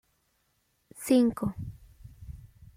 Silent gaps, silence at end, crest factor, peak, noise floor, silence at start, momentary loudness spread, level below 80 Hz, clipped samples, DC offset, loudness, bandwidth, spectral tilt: none; 0.3 s; 20 dB; -12 dBFS; -73 dBFS; 1 s; 25 LU; -54 dBFS; under 0.1%; under 0.1%; -27 LUFS; 16 kHz; -6 dB/octave